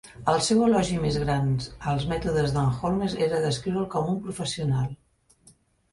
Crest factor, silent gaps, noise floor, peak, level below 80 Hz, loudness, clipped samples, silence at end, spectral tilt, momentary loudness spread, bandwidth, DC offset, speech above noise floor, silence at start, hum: 16 dB; none; -59 dBFS; -8 dBFS; -46 dBFS; -26 LUFS; under 0.1%; 0.95 s; -6 dB/octave; 8 LU; 11.5 kHz; under 0.1%; 34 dB; 0.05 s; none